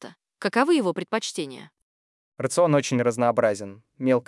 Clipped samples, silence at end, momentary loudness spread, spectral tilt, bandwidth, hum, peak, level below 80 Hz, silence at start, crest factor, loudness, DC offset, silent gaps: under 0.1%; 0.05 s; 13 LU; -5 dB/octave; 12 kHz; none; -6 dBFS; -78 dBFS; 0 s; 18 dB; -24 LUFS; under 0.1%; 1.82-2.32 s